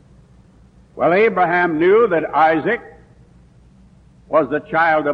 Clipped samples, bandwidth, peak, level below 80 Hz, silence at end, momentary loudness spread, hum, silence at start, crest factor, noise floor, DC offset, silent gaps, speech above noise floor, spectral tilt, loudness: under 0.1%; 5.8 kHz; -4 dBFS; -52 dBFS; 0 s; 6 LU; none; 0.95 s; 14 dB; -48 dBFS; under 0.1%; none; 33 dB; -8 dB/octave; -16 LUFS